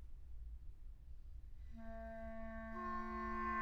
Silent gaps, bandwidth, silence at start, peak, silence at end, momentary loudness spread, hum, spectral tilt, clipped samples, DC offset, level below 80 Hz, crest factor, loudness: none; 6.4 kHz; 0 s; -30 dBFS; 0 s; 16 LU; none; -8 dB/octave; under 0.1%; under 0.1%; -52 dBFS; 16 dB; -49 LUFS